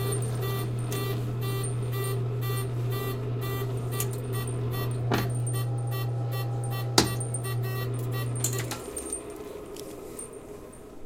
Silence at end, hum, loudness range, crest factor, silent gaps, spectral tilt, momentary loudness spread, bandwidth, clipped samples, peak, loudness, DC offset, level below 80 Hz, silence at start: 0 s; none; 4 LU; 28 dB; none; -5 dB/octave; 12 LU; 17 kHz; under 0.1%; -2 dBFS; -30 LUFS; under 0.1%; -48 dBFS; 0 s